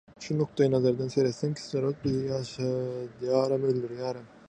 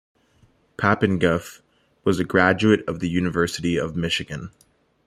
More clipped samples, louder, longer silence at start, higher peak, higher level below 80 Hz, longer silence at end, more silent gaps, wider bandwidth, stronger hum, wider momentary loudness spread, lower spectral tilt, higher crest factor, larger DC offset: neither; second, -29 LUFS vs -22 LUFS; second, 0.2 s vs 0.8 s; second, -12 dBFS vs -2 dBFS; second, -62 dBFS vs -52 dBFS; second, 0.2 s vs 0.6 s; neither; second, 9.6 kHz vs 15 kHz; neither; second, 9 LU vs 16 LU; first, -7 dB/octave vs -5.5 dB/octave; about the same, 18 dB vs 20 dB; neither